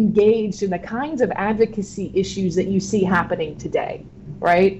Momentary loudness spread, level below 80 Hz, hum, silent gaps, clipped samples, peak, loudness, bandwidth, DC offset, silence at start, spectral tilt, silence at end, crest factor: 9 LU; -46 dBFS; none; none; under 0.1%; -6 dBFS; -21 LUFS; 8.4 kHz; under 0.1%; 0 s; -6.5 dB/octave; 0 s; 14 dB